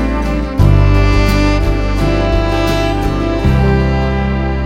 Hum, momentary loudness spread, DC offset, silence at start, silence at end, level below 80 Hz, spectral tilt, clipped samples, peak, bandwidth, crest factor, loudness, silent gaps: 50 Hz at -15 dBFS; 5 LU; under 0.1%; 0 s; 0 s; -16 dBFS; -7 dB/octave; under 0.1%; 0 dBFS; 15.5 kHz; 12 dB; -13 LUFS; none